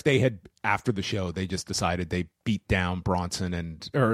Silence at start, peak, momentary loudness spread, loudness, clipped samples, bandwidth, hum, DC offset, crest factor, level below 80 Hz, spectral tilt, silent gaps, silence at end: 0.05 s; -8 dBFS; 6 LU; -28 LUFS; under 0.1%; 14.5 kHz; none; under 0.1%; 20 dB; -46 dBFS; -5.5 dB/octave; none; 0 s